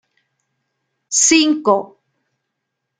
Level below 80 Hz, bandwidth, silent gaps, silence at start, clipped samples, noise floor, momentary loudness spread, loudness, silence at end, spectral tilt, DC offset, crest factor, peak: -62 dBFS; 10 kHz; none; 1.1 s; under 0.1%; -77 dBFS; 8 LU; -14 LUFS; 1.15 s; -1 dB/octave; under 0.1%; 18 dB; -2 dBFS